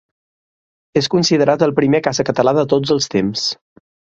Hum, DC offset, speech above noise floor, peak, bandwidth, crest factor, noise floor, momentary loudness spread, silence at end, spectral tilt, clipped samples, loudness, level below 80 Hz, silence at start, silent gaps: none; under 0.1%; over 75 dB; 0 dBFS; 8 kHz; 16 dB; under -90 dBFS; 7 LU; 0.6 s; -5 dB/octave; under 0.1%; -16 LUFS; -54 dBFS; 0.95 s; none